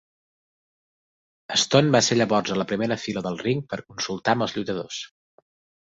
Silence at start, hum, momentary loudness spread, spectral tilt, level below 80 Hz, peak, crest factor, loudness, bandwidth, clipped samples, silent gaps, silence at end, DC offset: 1.5 s; none; 13 LU; -4 dB/octave; -62 dBFS; -4 dBFS; 20 dB; -23 LUFS; 8.2 kHz; under 0.1%; none; 0.8 s; under 0.1%